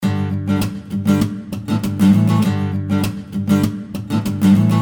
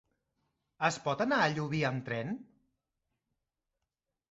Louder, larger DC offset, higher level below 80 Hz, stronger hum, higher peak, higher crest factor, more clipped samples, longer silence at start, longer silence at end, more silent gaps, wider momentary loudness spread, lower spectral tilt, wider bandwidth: first, -18 LUFS vs -32 LUFS; neither; first, -46 dBFS vs -70 dBFS; neither; first, -2 dBFS vs -14 dBFS; second, 14 dB vs 22 dB; neither; second, 0 s vs 0.8 s; second, 0 s vs 1.9 s; neither; about the same, 9 LU vs 9 LU; first, -7.5 dB/octave vs -4 dB/octave; first, over 20 kHz vs 8 kHz